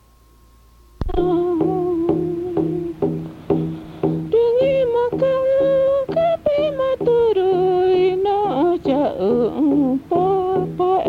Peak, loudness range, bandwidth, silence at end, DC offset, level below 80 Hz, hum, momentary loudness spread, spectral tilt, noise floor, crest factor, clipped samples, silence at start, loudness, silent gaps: -6 dBFS; 4 LU; 5.6 kHz; 0 s; under 0.1%; -40 dBFS; none; 7 LU; -9 dB/octave; -50 dBFS; 12 dB; under 0.1%; 1 s; -19 LUFS; none